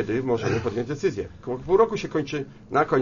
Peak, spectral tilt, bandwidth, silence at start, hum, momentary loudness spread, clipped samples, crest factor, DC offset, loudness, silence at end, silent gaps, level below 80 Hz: -6 dBFS; -6.5 dB/octave; 7.4 kHz; 0 s; none; 12 LU; under 0.1%; 18 dB; under 0.1%; -25 LUFS; 0 s; none; -50 dBFS